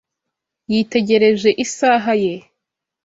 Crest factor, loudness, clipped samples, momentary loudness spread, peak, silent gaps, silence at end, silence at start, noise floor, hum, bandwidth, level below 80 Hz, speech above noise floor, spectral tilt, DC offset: 16 dB; -16 LUFS; under 0.1%; 8 LU; -2 dBFS; none; 0.65 s; 0.7 s; -80 dBFS; none; 8 kHz; -60 dBFS; 65 dB; -4.5 dB/octave; under 0.1%